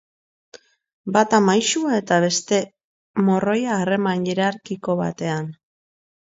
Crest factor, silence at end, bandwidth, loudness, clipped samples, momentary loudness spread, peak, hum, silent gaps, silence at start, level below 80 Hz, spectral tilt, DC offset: 20 dB; 0.8 s; 8 kHz; -20 LUFS; under 0.1%; 12 LU; -2 dBFS; none; 2.84-3.14 s; 1.05 s; -64 dBFS; -4.5 dB/octave; under 0.1%